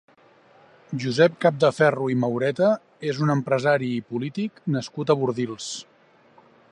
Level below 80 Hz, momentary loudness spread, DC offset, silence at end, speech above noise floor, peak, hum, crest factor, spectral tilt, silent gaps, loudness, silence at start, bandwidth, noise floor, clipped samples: -70 dBFS; 11 LU; under 0.1%; 0.9 s; 33 dB; -4 dBFS; none; 18 dB; -6 dB/octave; none; -23 LUFS; 0.9 s; 11 kHz; -56 dBFS; under 0.1%